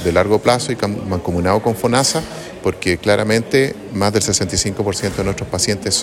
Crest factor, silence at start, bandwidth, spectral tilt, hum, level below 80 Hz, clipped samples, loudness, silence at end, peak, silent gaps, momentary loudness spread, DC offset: 16 dB; 0 s; 16.5 kHz; -4 dB/octave; none; -42 dBFS; under 0.1%; -17 LUFS; 0 s; 0 dBFS; none; 6 LU; under 0.1%